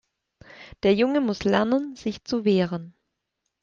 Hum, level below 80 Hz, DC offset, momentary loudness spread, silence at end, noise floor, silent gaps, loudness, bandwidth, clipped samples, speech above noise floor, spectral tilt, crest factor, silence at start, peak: none; -56 dBFS; under 0.1%; 10 LU; 0.75 s; -80 dBFS; none; -24 LUFS; 7.4 kHz; under 0.1%; 57 dB; -6.5 dB/octave; 18 dB; 0.6 s; -6 dBFS